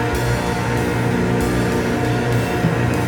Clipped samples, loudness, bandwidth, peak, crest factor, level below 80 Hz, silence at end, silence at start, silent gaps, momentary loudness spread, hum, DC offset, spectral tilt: under 0.1%; -19 LUFS; 19.5 kHz; -4 dBFS; 14 dB; -32 dBFS; 0 s; 0 s; none; 1 LU; none; under 0.1%; -6 dB/octave